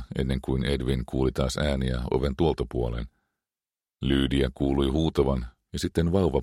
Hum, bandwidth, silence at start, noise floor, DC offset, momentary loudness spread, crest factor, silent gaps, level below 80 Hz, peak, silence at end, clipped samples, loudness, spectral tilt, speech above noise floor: none; 13.5 kHz; 0 s; under -90 dBFS; under 0.1%; 8 LU; 18 dB; none; -34 dBFS; -8 dBFS; 0 s; under 0.1%; -27 LUFS; -6.5 dB/octave; over 65 dB